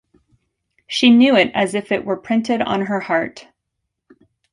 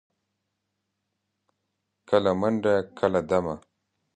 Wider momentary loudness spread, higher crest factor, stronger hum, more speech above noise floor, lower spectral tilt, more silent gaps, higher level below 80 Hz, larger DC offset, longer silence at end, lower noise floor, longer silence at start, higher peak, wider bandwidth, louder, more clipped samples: first, 10 LU vs 6 LU; about the same, 18 dB vs 22 dB; neither; first, 60 dB vs 56 dB; second, -5 dB/octave vs -7 dB/octave; neither; about the same, -60 dBFS vs -56 dBFS; neither; first, 1.1 s vs 0.6 s; about the same, -77 dBFS vs -80 dBFS; second, 0.9 s vs 2.1 s; first, -2 dBFS vs -6 dBFS; first, 11 kHz vs 9.4 kHz; first, -17 LUFS vs -25 LUFS; neither